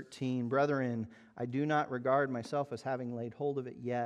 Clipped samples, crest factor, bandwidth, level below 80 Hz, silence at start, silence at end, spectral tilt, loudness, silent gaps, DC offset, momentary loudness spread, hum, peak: under 0.1%; 18 dB; 11.5 kHz; -78 dBFS; 0 s; 0 s; -7.5 dB/octave; -35 LUFS; none; under 0.1%; 9 LU; none; -16 dBFS